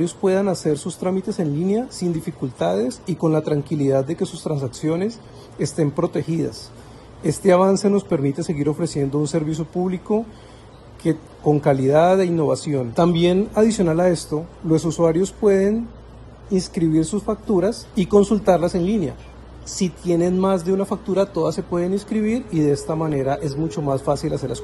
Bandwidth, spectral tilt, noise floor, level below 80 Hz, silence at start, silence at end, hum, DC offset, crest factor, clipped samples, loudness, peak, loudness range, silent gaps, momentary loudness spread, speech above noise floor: 12.5 kHz; -6.5 dB/octave; -42 dBFS; -46 dBFS; 0 s; 0 s; none; under 0.1%; 18 dB; under 0.1%; -21 LUFS; -2 dBFS; 4 LU; none; 9 LU; 22 dB